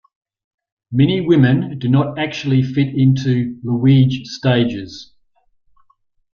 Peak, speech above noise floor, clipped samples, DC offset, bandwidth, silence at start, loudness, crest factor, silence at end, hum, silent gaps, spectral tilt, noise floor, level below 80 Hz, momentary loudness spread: -2 dBFS; 45 dB; under 0.1%; under 0.1%; 6.8 kHz; 0.9 s; -16 LUFS; 14 dB; 1.3 s; none; none; -8 dB/octave; -60 dBFS; -52 dBFS; 9 LU